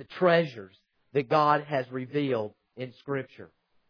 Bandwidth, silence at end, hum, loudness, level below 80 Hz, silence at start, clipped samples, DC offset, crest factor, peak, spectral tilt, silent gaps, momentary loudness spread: 5.4 kHz; 0.45 s; none; -27 LUFS; -78 dBFS; 0 s; under 0.1%; under 0.1%; 20 dB; -8 dBFS; -8 dB/octave; none; 18 LU